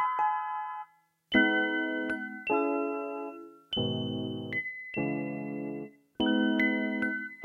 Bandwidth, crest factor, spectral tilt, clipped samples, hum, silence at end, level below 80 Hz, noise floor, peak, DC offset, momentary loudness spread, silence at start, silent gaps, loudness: 11 kHz; 20 dB; -7 dB/octave; under 0.1%; none; 0 s; -64 dBFS; -56 dBFS; -10 dBFS; under 0.1%; 14 LU; 0 s; none; -31 LUFS